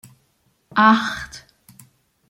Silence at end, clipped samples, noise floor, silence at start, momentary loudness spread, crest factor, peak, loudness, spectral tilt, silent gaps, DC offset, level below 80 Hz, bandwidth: 0.9 s; under 0.1%; -65 dBFS; 0.75 s; 22 LU; 20 dB; -2 dBFS; -17 LUFS; -4.5 dB/octave; none; under 0.1%; -56 dBFS; 16 kHz